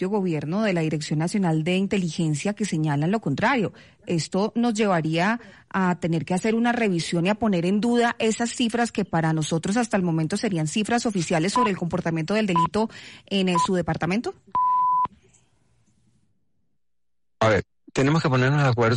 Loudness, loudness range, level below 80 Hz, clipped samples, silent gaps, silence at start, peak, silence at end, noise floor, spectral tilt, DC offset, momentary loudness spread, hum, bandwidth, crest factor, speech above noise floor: -23 LUFS; 4 LU; -56 dBFS; under 0.1%; none; 0 s; -12 dBFS; 0 s; -86 dBFS; -5.5 dB/octave; under 0.1%; 5 LU; none; 11.5 kHz; 12 dB; 63 dB